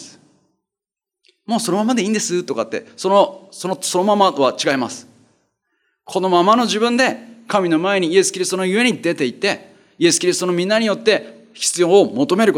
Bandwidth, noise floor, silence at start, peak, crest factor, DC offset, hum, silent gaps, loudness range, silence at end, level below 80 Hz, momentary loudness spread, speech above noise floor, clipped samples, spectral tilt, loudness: 16.5 kHz; -87 dBFS; 0 s; -2 dBFS; 16 dB; under 0.1%; none; none; 3 LU; 0 s; -70 dBFS; 9 LU; 70 dB; under 0.1%; -3.5 dB/octave; -17 LUFS